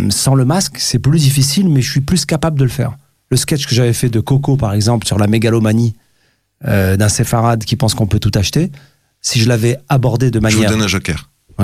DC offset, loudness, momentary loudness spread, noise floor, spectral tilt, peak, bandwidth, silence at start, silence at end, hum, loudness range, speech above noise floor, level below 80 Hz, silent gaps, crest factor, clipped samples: under 0.1%; -14 LUFS; 6 LU; -59 dBFS; -5 dB/octave; -2 dBFS; 16 kHz; 0 s; 0 s; none; 1 LU; 46 dB; -36 dBFS; none; 12 dB; under 0.1%